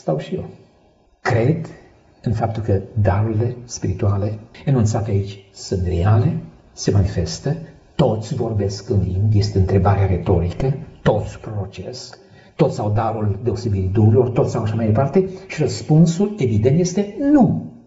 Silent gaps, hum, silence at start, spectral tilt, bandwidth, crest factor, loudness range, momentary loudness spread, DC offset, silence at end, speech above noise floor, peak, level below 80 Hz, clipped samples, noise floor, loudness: none; none; 0.05 s; -8 dB/octave; 8 kHz; 16 dB; 4 LU; 13 LU; under 0.1%; 0.1 s; 37 dB; -2 dBFS; -38 dBFS; under 0.1%; -55 dBFS; -19 LUFS